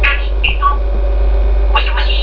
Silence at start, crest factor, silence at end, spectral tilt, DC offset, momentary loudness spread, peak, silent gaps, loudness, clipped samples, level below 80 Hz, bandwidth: 0 s; 12 dB; 0 s; -7 dB/octave; under 0.1%; 3 LU; 0 dBFS; none; -15 LUFS; under 0.1%; -12 dBFS; 5.4 kHz